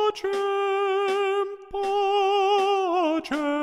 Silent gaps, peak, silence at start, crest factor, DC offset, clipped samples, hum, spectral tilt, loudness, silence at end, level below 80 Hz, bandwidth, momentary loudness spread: none; -12 dBFS; 0 s; 12 dB; under 0.1%; under 0.1%; none; -3 dB/octave; -24 LUFS; 0 s; -60 dBFS; 11.5 kHz; 6 LU